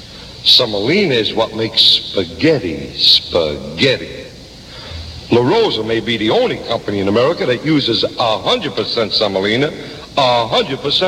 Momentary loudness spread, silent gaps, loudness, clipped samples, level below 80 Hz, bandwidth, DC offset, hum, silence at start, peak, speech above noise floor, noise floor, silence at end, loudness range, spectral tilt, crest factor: 16 LU; none; -14 LUFS; under 0.1%; -42 dBFS; 14 kHz; under 0.1%; none; 0 s; 0 dBFS; 20 dB; -35 dBFS; 0 s; 4 LU; -4.5 dB/octave; 16 dB